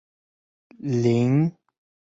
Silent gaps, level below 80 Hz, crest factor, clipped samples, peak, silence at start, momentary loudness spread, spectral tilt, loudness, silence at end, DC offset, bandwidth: none; -62 dBFS; 16 dB; under 0.1%; -8 dBFS; 0.85 s; 8 LU; -8.5 dB/octave; -22 LUFS; 0.7 s; under 0.1%; 7.8 kHz